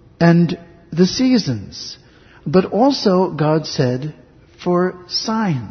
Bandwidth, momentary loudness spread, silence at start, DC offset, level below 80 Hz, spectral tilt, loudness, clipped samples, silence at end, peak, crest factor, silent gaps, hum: 6.6 kHz; 16 LU; 0.2 s; under 0.1%; -50 dBFS; -6.5 dB/octave; -17 LUFS; under 0.1%; 0 s; 0 dBFS; 16 dB; none; none